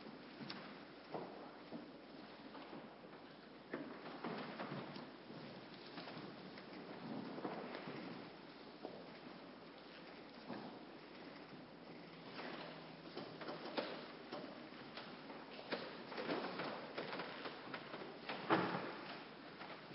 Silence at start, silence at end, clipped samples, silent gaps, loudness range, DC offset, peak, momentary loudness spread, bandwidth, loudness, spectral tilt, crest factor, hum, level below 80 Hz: 0 s; 0 s; under 0.1%; none; 9 LU; under 0.1%; -20 dBFS; 10 LU; 5.6 kHz; -50 LUFS; -3 dB/octave; 28 dB; none; -82 dBFS